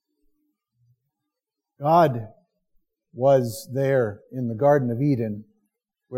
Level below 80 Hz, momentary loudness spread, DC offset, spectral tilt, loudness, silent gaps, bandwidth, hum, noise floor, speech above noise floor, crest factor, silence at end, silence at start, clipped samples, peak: -68 dBFS; 12 LU; under 0.1%; -7.5 dB/octave; -22 LUFS; none; 16.5 kHz; none; -85 dBFS; 64 dB; 18 dB; 0 s; 1.8 s; under 0.1%; -6 dBFS